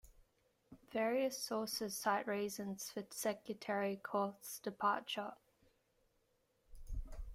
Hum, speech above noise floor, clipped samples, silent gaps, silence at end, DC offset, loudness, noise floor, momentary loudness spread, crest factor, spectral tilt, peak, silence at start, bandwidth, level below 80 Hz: none; 39 dB; under 0.1%; none; 0 s; under 0.1%; -41 LUFS; -79 dBFS; 9 LU; 22 dB; -3.5 dB/octave; -22 dBFS; 0.05 s; 16 kHz; -56 dBFS